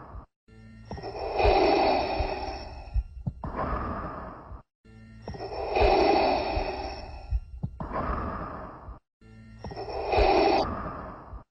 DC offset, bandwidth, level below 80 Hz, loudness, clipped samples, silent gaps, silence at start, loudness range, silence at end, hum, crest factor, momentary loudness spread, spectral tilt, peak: under 0.1%; 7.2 kHz; -38 dBFS; -28 LUFS; under 0.1%; 0.36-0.47 s, 4.75-4.84 s, 9.13-9.21 s; 0 s; 8 LU; 0.1 s; none; 18 dB; 21 LU; -7 dB/octave; -10 dBFS